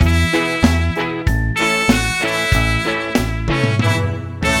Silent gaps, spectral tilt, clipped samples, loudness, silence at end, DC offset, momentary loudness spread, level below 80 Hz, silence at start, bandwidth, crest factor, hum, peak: none; -5 dB/octave; under 0.1%; -17 LUFS; 0 s; under 0.1%; 5 LU; -24 dBFS; 0 s; 17.5 kHz; 14 dB; none; -2 dBFS